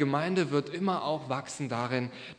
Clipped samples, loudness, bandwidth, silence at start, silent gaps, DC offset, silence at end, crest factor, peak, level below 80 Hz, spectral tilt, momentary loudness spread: under 0.1%; -31 LUFS; 10.5 kHz; 0 s; none; under 0.1%; 0.05 s; 18 dB; -14 dBFS; -74 dBFS; -6 dB/octave; 6 LU